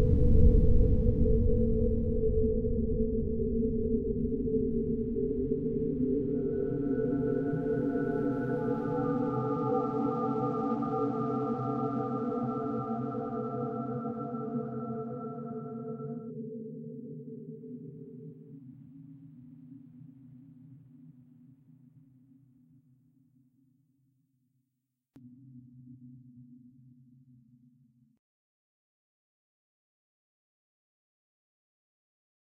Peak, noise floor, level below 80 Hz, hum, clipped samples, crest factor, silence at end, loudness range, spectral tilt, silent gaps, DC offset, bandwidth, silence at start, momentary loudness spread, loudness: -10 dBFS; -84 dBFS; -36 dBFS; none; under 0.1%; 22 dB; 6.05 s; 19 LU; -12 dB/octave; none; under 0.1%; 3.2 kHz; 0 s; 23 LU; -31 LUFS